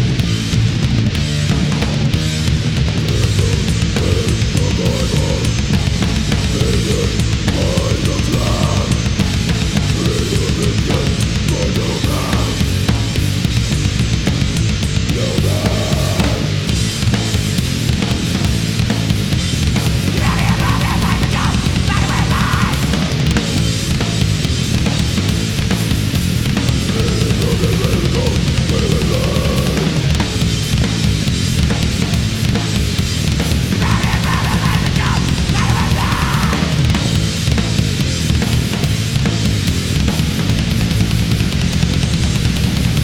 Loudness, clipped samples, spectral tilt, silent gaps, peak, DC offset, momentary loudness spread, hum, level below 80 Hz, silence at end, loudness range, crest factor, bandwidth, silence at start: -16 LUFS; under 0.1%; -5 dB/octave; none; 0 dBFS; under 0.1%; 2 LU; none; -22 dBFS; 0 s; 1 LU; 14 dB; 17 kHz; 0 s